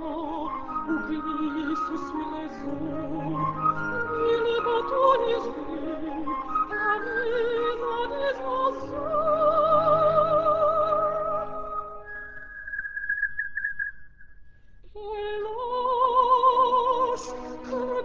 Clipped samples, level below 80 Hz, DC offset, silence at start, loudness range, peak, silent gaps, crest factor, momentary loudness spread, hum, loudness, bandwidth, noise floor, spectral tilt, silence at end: under 0.1%; -52 dBFS; under 0.1%; 0 s; 8 LU; -8 dBFS; none; 18 dB; 13 LU; none; -26 LUFS; 7.6 kHz; -47 dBFS; -6 dB/octave; 0 s